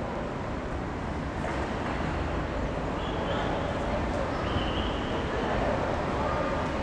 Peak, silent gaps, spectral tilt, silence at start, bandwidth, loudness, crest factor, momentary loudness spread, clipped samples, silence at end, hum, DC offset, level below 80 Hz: -16 dBFS; none; -6.5 dB/octave; 0 s; 10 kHz; -30 LUFS; 14 dB; 5 LU; under 0.1%; 0 s; none; under 0.1%; -38 dBFS